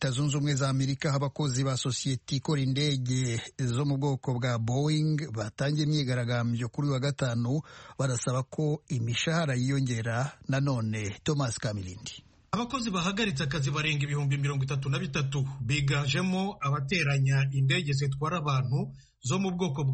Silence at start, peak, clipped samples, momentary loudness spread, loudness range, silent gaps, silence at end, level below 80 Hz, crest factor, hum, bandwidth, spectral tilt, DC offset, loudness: 0 s; -14 dBFS; under 0.1%; 5 LU; 3 LU; none; 0 s; -56 dBFS; 14 dB; none; 8.8 kHz; -5.5 dB/octave; under 0.1%; -29 LUFS